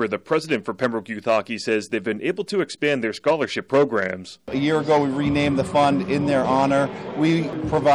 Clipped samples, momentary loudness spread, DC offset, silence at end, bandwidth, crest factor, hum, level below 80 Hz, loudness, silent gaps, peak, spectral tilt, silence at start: under 0.1%; 6 LU; under 0.1%; 0 s; 11.5 kHz; 14 dB; none; -52 dBFS; -22 LUFS; none; -8 dBFS; -6 dB/octave; 0 s